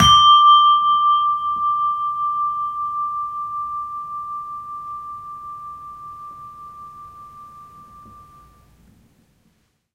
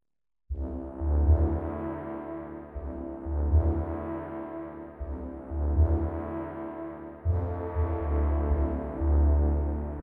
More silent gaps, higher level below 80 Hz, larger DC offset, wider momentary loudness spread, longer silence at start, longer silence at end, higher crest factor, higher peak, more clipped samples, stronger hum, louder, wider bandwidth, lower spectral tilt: neither; second, -46 dBFS vs -30 dBFS; neither; first, 27 LU vs 14 LU; second, 0 s vs 0.5 s; first, 1.75 s vs 0 s; about the same, 18 dB vs 16 dB; first, -2 dBFS vs -12 dBFS; neither; neither; first, -17 LUFS vs -30 LUFS; first, 13.5 kHz vs 2.6 kHz; second, -2 dB/octave vs -12.5 dB/octave